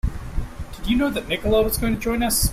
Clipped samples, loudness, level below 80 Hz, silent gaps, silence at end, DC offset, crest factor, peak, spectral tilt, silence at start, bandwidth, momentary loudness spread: under 0.1%; -22 LUFS; -28 dBFS; none; 0 s; under 0.1%; 16 dB; -6 dBFS; -4.5 dB/octave; 0.05 s; 16 kHz; 13 LU